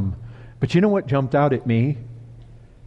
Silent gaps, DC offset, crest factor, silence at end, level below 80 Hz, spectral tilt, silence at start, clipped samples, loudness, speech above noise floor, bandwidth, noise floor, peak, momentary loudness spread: none; under 0.1%; 16 dB; 0 s; -48 dBFS; -8.5 dB/octave; 0 s; under 0.1%; -21 LUFS; 25 dB; 8.2 kHz; -44 dBFS; -6 dBFS; 21 LU